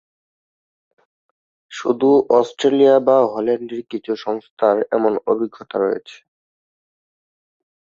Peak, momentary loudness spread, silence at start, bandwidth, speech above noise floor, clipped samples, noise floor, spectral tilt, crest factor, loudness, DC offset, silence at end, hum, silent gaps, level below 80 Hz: -2 dBFS; 13 LU; 1.7 s; 7.6 kHz; over 73 dB; under 0.1%; under -90 dBFS; -6 dB/octave; 18 dB; -18 LUFS; under 0.1%; 1.8 s; none; 4.51-4.57 s; -68 dBFS